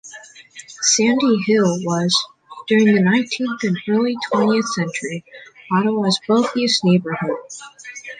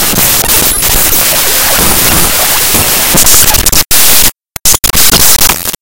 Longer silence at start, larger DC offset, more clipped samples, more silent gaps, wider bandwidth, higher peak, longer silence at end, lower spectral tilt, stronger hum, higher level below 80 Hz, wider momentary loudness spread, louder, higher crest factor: about the same, 0.05 s vs 0 s; neither; second, under 0.1% vs 7%; neither; second, 9.6 kHz vs over 20 kHz; second, -4 dBFS vs 0 dBFS; about the same, 0.05 s vs 0 s; first, -4 dB/octave vs -1 dB/octave; neither; second, -64 dBFS vs -22 dBFS; first, 19 LU vs 3 LU; second, -18 LUFS vs -4 LUFS; first, 16 dB vs 8 dB